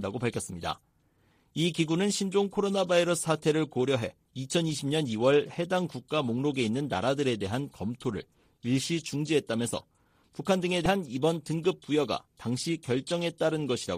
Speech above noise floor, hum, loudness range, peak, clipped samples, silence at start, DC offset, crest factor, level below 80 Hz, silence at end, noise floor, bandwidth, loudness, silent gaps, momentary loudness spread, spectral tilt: 39 dB; none; 3 LU; -12 dBFS; under 0.1%; 0 s; under 0.1%; 18 dB; -60 dBFS; 0 s; -67 dBFS; 15 kHz; -29 LUFS; none; 9 LU; -5 dB/octave